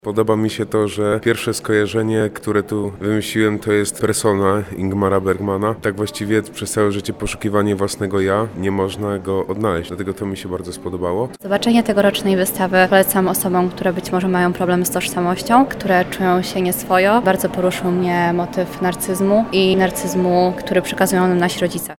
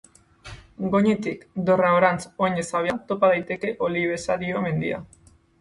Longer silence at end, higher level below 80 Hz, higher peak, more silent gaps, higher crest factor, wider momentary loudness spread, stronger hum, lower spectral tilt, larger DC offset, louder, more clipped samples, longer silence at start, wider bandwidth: second, 0.05 s vs 0.55 s; first, -46 dBFS vs -56 dBFS; first, 0 dBFS vs -4 dBFS; neither; about the same, 16 dB vs 20 dB; second, 7 LU vs 12 LU; neither; about the same, -5 dB/octave vs -6 dB/octave; neither; first, -18 LUFS vs -23 LUFS; neither; second, 0.05 s vs 0.45 s; first, 18.5 kHz vs 11.5 kHz